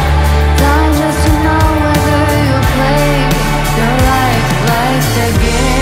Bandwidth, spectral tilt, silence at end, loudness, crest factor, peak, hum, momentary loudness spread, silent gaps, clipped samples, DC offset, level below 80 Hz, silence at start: 16.5 kHz; -5.5 dB/octave; 0 s; -11 LUFS; 10 dB; 0 dBFS; none; 2 LU; none; under 0.1%; under 0.1%; -16 dBFS; 0 s